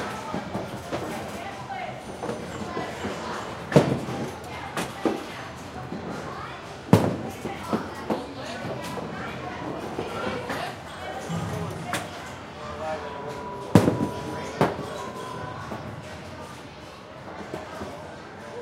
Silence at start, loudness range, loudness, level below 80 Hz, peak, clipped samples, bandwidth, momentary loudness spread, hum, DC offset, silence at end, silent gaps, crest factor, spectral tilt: 0 s; 6 LU; -30 LUFS; -54 dBFS; 0 dBFS; under 0.1%; 16 kHz; 16 LU; none; under 0.1%; 0 s; none; 28 dB; -6 dB/octave